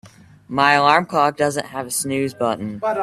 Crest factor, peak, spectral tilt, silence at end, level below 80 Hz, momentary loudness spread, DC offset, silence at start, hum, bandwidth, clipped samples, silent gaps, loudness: 20 dB; 0 dBFS; -3.5 dB/octave; 0 s; -60 dBFS; 10 LU; under 0.1%; 0.05 s; none; 15.5 kHz; under 0.1%; none; -19 LUFS